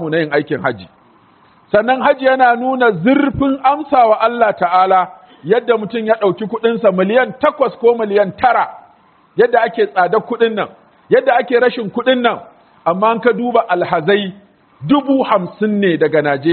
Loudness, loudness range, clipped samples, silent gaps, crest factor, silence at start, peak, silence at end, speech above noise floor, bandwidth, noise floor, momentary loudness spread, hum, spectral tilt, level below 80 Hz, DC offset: -14 LUFS; 3 LU; under 0.1%; none; 14 dB; 0 s; 0 dBFS; 0 s; 36 dB; 4.5 kHz; -50 dBFS; 6 LU; none; -4 dB/octave; -50 dBFS; under 0.1%